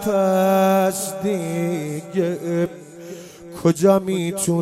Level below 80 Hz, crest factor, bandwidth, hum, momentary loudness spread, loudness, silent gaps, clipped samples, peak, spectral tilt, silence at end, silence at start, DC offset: -58 dBFS; 16 dB; 16.5 kHz; none; 20 LU; -20 LUFS; none; under 0.1%; -4 dBFS; -6 dB/octave; 0 s; 0 s; under 0.1%